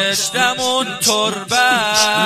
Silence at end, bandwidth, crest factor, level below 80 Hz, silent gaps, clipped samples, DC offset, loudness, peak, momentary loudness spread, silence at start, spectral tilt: 0 s; 15.5 kHz; 16 dB; -60 dBFS; none; under 0.1%; under 0.1%; -15 LUFS; 0 dBFS; 4 LU; 0 s; -1 dB/octave